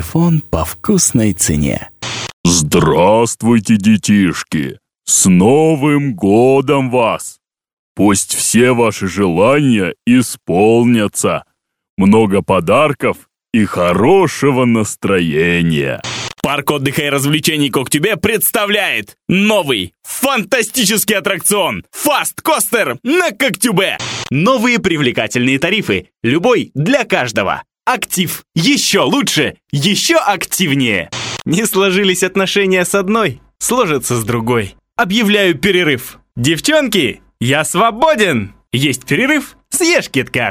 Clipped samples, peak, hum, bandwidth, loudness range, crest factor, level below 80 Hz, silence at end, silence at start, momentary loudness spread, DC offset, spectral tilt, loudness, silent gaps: under 0.1%; 0 dBFS; none; over 20 kHz; 2 LU; 14 dB; -42 dBFS; 0 s; 0 s; 8 LU; under 0.1%; -4 dB/octave; -13 LUFS; 2.33-2.44 s, 7.73-7.95 s, 11.89-11.97 s